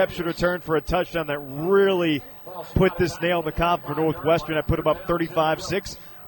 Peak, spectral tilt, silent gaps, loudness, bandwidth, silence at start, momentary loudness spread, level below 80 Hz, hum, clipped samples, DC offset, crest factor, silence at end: -6 dBFS; -6 dB/octave; none; -23 LUFS; 17.5 kHz; 0 s; 8 LU; -40 dBFS; none; under 0.1%; under 0.1%; 16 dB; 0 s